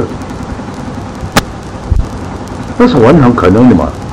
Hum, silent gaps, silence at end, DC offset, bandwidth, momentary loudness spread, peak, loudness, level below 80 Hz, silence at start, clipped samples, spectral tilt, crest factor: none; none; 0 s; under 0.1%; 16.5 kHz; 16 LU; 0 dBFS; -9 LUFS; -22 dBFS; 0 s; 2%; -7 dB/octave; 10 dB